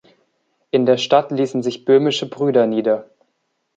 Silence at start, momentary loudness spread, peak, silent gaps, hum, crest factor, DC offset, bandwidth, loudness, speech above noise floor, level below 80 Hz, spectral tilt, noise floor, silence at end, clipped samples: 0.75 s; 6 LU; -2 dBFS; none; none; 16 dB; under 0.1%; 7.8 kHz; -18 LUFS; 54 dB; -70 dBFS; -5.5 dB/octave; -71 dBFS; 0.75 s; under 0.1%